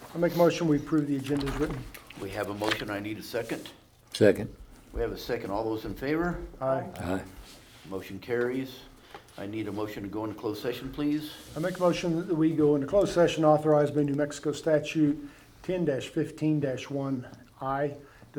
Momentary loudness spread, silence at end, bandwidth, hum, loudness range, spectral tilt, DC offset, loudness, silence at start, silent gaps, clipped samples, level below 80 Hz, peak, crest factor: 17 LU; 0 s; 19 kHz; none; 9 LU; -6.5 dB/octave; under 0.1%; -29 LUFS; 0 s; none; under 0.1%; -50 dBFS; -8 dBFS; 22 dB